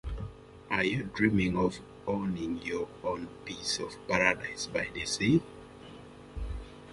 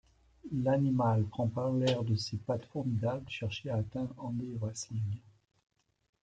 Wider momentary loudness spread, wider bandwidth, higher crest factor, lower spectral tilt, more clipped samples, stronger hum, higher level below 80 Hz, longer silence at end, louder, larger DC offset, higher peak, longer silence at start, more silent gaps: first, 19 LU vs 9 LU; first, 11.5 kHz vs 9.2 kHz; first, 24 dB vs 18 dB; second, -4.5 dB/octave vs -6.5 dB/octave; neither; neither; first, -48 dBFS vs -64 dBFS; second, 0 s vs 1 s; first, -31 LUFS vs -34 LUFS; neither; first, -8 dBFS vs -16 dBFS; second, 0.05 s vs 0.45 s; neither